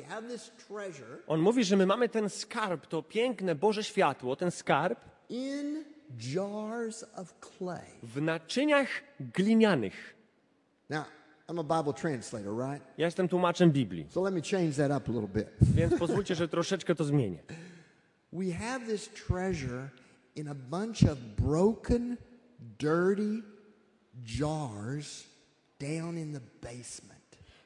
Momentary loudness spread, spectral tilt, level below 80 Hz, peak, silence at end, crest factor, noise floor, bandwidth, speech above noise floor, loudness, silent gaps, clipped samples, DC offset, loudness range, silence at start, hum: 17 LU; -6 dB/octave; -52 dBFS; -8 dBFS; 0.6 s; 24 dB; -70 dBFS; 11.5 kHz; 39 dB; -31 LUFS; none; under 0.1%; under 0.1%; 8 LU; 0 s; none